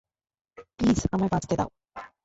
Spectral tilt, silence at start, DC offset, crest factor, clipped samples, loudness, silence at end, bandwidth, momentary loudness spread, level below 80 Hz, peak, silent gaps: -6.5 dB/octave; 0.6 s; under 0.1%; 18 dB; under 0.1%; -26 LUFS; 0.2 s; 8 kHz; 17 LU; -44 dBFS; -12 dBFS; none